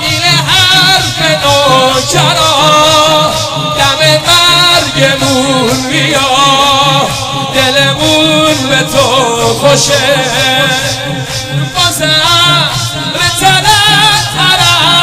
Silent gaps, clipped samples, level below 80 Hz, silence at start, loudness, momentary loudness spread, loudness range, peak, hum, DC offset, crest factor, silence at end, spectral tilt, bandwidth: none; 1%; -34 dBFS; 0 s; -7 LUFS; 7 LU; 3 LU; 0 dBFS; none; under 0.1%; 8 dB; 0 s; -2.5 dB/octave; 18 kHz